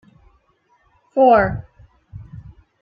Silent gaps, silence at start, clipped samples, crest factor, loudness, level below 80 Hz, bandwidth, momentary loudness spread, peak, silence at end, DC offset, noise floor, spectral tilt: none; 1.15 s; under 0.1%; 18 dB; -16 LUFS; -44 dBFS; 5.2 kHz; 26 LU; -2 dBFS; 0.4 s; under 0.1%; -61 dBFS; -10 dB/octave